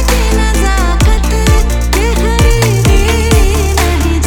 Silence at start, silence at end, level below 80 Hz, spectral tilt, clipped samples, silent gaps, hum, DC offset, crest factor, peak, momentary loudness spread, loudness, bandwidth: 0 s; 0 s; -10 dBFS; -5 dB/octave; under 0.1%; none; none; under 0.1%; 8 dB; 0 dBFS; 2 LU; -11 LUFS; 19.5 kHz